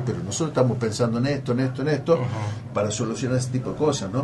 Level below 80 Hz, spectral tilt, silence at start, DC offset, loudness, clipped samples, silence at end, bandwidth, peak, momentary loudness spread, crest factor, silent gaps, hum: -54 dBFS; -6 dB/octave; 0 s; under 0.1%; -24 LUFS; under 0.1%; 0 s; 11.5 kHz; -6 dBFS; 5 LU; 18 dB; none; none